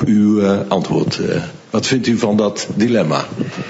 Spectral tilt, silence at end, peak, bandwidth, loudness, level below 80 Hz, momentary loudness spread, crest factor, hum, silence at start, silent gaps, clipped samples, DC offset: -5.5 dB/octave; 0 s; -2 dBFS; 8 kHz; -16 LUFS; -52 dBFS; 7 LU; 14 dB; none; 0 s; none; under 0.1%; under 0.1%